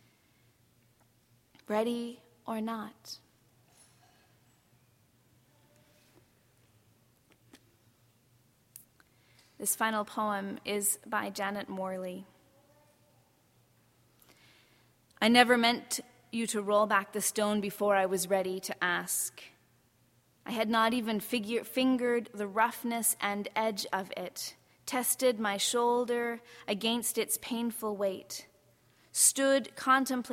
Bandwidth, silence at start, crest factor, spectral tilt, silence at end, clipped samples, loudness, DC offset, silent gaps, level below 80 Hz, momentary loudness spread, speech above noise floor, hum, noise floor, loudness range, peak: 16.5 kHz; 1.7 s; 28 dB; -2.5 dB/octave; 0 s; under 0.1%; -30 LUFS; under 0.1%; none; -76 dBFS; 14 LU; 37 dB; none; -68 dBFS; 11 LU; -6 dBFS